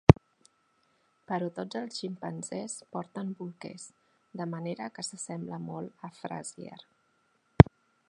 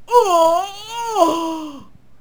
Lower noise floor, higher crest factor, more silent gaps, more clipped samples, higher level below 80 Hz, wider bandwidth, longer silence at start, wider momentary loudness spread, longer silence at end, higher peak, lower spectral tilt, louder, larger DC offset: first, -72 dBFS vs -41 dBFS; first, 30 dB vs 18 dB; neither; neither; first, -44 dBFS vs -56 dBFS; second, 11 kHz vs over 20 kHz; about the same, 0.1 s vs 0.05 s; first, 23 LU vs 14 LU; about the same, 0.45 s vs 0.35 s; about the same, 0 dBFS vs 0 dBFS; first, -7 dB/octave vs -3 dB/octave; second, -30 LUFS vs -17 LUFS; second, under 0.1% vs 0.8%